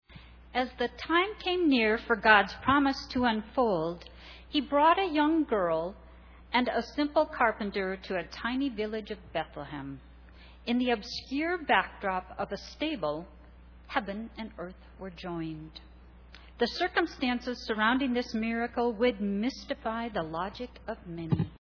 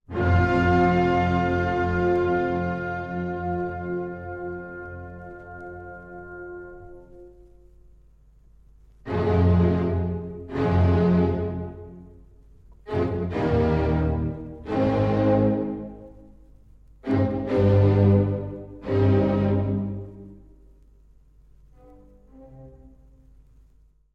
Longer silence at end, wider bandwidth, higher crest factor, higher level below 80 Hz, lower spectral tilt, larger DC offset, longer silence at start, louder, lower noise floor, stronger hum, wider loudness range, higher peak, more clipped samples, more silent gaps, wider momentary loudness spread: second, 0.05 s vs 1.25 s; second, 5.4 kHz vs 6.2 kHz; first, 24 dB vs 18 dB; second, -52 dBFS vs -44 dBFS; second, -6 dB/octave vs -9.5 dB/octave; neither; about the same, 0.1 s vs 0.1 s; second, -30 LUFS vs -23 LUFS; second, -52 dBFS vs -57 dBFS; neither; second, 10 LU vs 16 LU; about the same, -6 dBFS vs -8 dBFS; neither; neither; second, 15 LU vs 20 LU